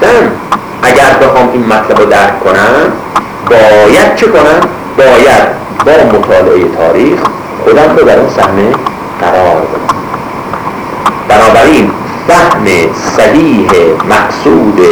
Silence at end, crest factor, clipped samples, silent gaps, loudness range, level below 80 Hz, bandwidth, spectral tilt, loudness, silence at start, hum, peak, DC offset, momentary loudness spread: 0 s; 6 dB; 5%; none; 3 LU; -34 dBFS; over 20 kHz; -5 dB/octave; -6 LUFS; 0 s; none; 0 dBFS; under 0.1%; 10 LU